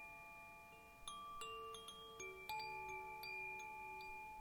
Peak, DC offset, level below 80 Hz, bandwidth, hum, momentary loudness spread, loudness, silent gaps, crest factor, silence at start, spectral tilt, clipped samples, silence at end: -34 dBFS; under 0.1%; -72 dBFS; 19.5 kHz; none; 9 LU; -51 LUFS; none; 18 dB; 0 s; -2 dB/octave; under 0.1%; 0 s